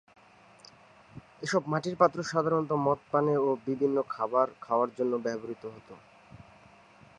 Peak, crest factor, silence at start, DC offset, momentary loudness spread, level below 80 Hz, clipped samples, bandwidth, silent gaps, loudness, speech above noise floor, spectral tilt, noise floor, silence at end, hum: -8 dBFS; 22 dB; 1.15 s; under 0.1%; 12 LU; -70 dBFS; under 0.1%; 11 kHz; none; -29 LUFS; 28 dB; -6.5 dB/octave; -57 dBFS; 0.75 s; none